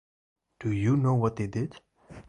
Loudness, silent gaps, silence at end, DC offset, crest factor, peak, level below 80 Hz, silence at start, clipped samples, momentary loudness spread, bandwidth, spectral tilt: -28 LUFS; none; 0.1 s; under 0.1%; 16 dB; -12 dBFS; -54 dBFS; 0.6 s; under 0.1%; 11 LU; 9.8 kHz; -8.5 dB/octave